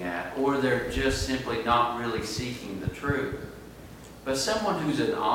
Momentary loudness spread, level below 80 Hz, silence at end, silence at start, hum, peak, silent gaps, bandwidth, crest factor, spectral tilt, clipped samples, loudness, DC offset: 15 LU; -44 dBFS; 0 s; 0 s; none; -10 dBFS; none; 17 kHz; 18 dB; -4.5 dB/octave; under 0.1%; -28 LUFS; under 0.1%